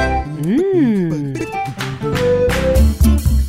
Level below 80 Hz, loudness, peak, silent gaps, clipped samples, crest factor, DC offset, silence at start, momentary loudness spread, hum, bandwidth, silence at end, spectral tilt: -20 dBFS; -16 LUFS; -2 dBFS; none; under 0.1%; 12 dB; under 0.1%; 0 s; 9 LU; none; 16.5 kHz; 0 s; -7 dB/octave